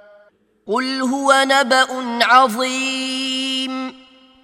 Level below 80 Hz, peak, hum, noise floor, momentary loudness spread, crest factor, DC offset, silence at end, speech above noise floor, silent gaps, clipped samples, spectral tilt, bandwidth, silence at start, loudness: -70 dBFS; 0 dBFS; none; -54 dBFS; 10 LU; 18 dB; under 0.1%; 0.5 s; 38 dB; none; under 0.1%; -1.5 dB/octave; 16.5 kHz; 0.65 s; -17 LUFS